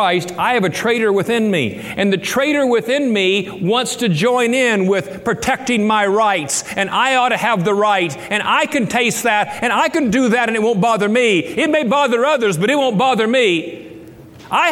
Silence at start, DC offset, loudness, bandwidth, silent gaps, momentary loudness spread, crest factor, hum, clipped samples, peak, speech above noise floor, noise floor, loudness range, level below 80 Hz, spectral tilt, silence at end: 0 s; under 0.1%; -16 LUFS; 17 kHz; none; 4 LU; 14 dB; none; under 0.1%; -2 dBFS; 22 dB; -38 dBFS; 1 LU; -54 dBFS; -4 dB/octave; 0 s